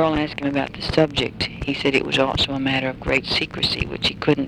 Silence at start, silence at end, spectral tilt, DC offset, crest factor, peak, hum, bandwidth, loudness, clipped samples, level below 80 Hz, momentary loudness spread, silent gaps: 0 s; 0 s; -5 dB/octave; under 0.1%; 20 dB; -2 dBFS; none; 13 kHz; -21 LUFS; under 0.1%; -40 dBFS; 5 LU; none